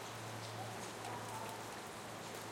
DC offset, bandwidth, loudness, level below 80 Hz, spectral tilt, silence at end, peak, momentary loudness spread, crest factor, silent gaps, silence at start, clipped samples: under 0.1%; 16.5 kHz; -46 LUFS; -76 dBFS; -3.5 dB/octave; 0 s; -34 dBFS; 3 LU; 14 dB; none; 0 s; under 0.1%